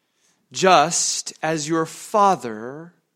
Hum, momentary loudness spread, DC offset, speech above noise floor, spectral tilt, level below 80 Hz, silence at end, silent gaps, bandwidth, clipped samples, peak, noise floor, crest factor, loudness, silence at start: none; 18 LU; under 0.1%; 45 dB; -3 dB/octave; -68 dBFS; 0.3 s; none; 16.5 kHz; under 0.1%; 0 dBFS; -65 dBFS; 20 dB; -19 LUFS; 0.55 s